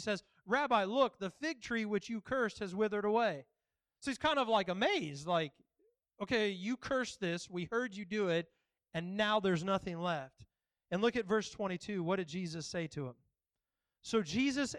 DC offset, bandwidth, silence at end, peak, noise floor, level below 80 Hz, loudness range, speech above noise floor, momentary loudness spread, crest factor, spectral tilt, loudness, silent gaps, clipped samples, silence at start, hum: under 0.1%; 11.5 kHz; 0 s; -18 dBFS; under -90 dBFS; -70 dBFS; 3 LU; over 55 dB; 10 LU; 20 dB; -5 dB/octave; -36 LUFS; none; under 0.1%; 0 s; none